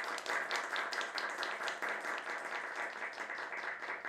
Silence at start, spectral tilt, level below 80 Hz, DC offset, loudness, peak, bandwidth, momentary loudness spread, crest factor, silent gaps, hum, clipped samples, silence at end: 0 s; -0.5 dB/octave; -88 dBFS; under 0.1%; -39 LUFS; -20 dBFS; 16 kHz; 4 LU; 20 dB; none; none; under 0.1%; 0 s